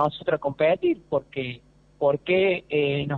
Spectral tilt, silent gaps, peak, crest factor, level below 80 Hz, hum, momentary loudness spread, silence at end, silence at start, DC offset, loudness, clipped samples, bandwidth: -8.5 dB/octave; none; -8 dBFS; 16 dB; -58 dBFS; none; 11 LU; 0 s; 0 s; under 0.1%; -24 LUFS; under 0.1%; 4.7 kHz